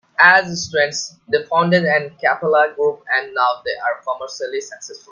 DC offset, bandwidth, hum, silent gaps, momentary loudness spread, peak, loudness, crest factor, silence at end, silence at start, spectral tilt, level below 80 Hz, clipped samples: under 0.1%; 10 kHz; none; none; 14 LU; 0 dBFS; -17 LUFS; 18 dB; 0.15 s; 0.2 s; -3.5 dB/octave; -62 dBFS; under 0.1%